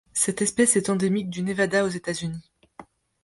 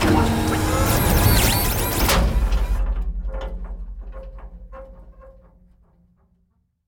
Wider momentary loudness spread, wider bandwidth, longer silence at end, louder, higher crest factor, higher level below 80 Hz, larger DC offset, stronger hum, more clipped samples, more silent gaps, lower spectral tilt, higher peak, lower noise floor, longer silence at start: second, 11 LU vs 24 LU; second, 12 kHz vs over 20 kHz; second, 0.4 s vs 1.55 s; second, -23 LUFS vs -20 LUFS; about the same, 20 dB vs 18 dB; second, -60 dBFS vs -26 dBFS; neither; neither; neither; neither; about the same, -4 dB/octave vs -4.5 dB/octave; about the same, -6 dBFS vs -4 dBFS; second, -49 dBFS vs -66 dBFS; first, 0.15 s vs 0 s